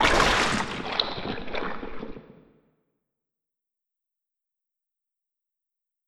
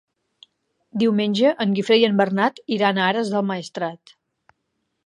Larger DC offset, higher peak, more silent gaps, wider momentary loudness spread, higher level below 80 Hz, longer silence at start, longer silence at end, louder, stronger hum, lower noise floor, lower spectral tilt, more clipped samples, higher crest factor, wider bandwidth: neither; about the same, -4 dBFS vs -4 dBFS; neither; first, 20 LU vs 11 LU; first, -42 dBFS vs -74 dBFS; second, 0 s vs 0.95 s; first, 3.75 s vs 1.1 s; second, -25 LUFS vs -20 LUFS; neither; first, -87 dBFS vs -75 dBFS; second, -3 dB/octave vs -6 dB/octave; neither; first, 26 dB vs 18 dB; first, 15.5 kHz vs 11 kHz